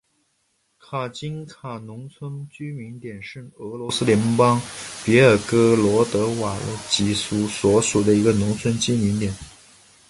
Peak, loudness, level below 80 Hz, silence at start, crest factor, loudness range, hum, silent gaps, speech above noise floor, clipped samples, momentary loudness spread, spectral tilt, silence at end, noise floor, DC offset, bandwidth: -2 dBFS; -20 LUFS; -48 dBFS; 0.9 s; 20 dB; 14 LU; none; none; 48 dB; under 0.1%; 18 LU; -5 dB/octave; 0.6 s; -69 dBFS; under 0.1%; 11.5 kHz